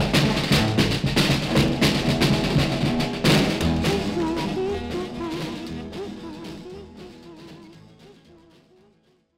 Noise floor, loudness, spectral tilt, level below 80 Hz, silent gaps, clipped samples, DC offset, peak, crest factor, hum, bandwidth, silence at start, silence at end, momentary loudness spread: -62 dBFS; -22 LUFS; -5 dB/octave; -38 dBFS; none; under 0.1%; under 0.1%; -6 dBFS; 18 dB; none; 16 kHz; 0 s; 1.25 s; 21 LU